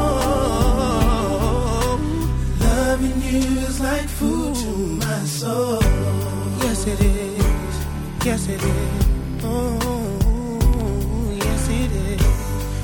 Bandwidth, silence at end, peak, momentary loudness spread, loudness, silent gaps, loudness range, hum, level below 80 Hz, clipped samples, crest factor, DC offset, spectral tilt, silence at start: 18 kHz; 0 s; -4 dBFS; 4 LU; -21 LUFS; none; 2 LU; none; -22 dBFS; under 0.1%; 14 dB; under 0.1%; -5.5 dB/octave; 0 s